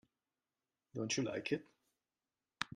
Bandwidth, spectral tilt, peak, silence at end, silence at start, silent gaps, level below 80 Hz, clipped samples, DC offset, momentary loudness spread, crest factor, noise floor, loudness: 12 kHz; -3.5 dB/octave; -16 dBFS; 0 s; 0.95 s; none; -82 dBFS; under 0.1%; under 0.1%; 8 LU; 30 dB; under -90 dBFS; -40 LUFS